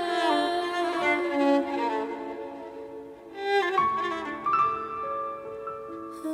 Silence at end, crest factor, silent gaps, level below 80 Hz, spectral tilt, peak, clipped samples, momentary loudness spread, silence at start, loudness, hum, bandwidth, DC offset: 0 s; 16 dB; none; -66 dBFS; -4 dB/octave; -12 dBFS; under 0.1%; 15 LU; 0 s; -27 LUFS; none; 15.5 kHz; under 0.1%